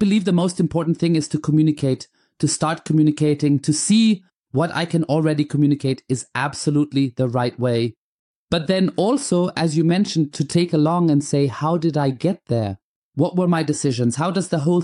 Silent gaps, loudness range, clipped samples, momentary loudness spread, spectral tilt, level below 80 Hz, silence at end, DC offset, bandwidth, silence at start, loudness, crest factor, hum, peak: 4.36-4.42 s, 7.97-8.48 s, 12.82-13.12 s; 2 LU; under 0.1%; 6 LU; -6 dB/octave; -58 dBFS; 0 s; under 0.1%; 11 kHz; 0 s; -20 LUFS; 14 dB; none; -6 dBFS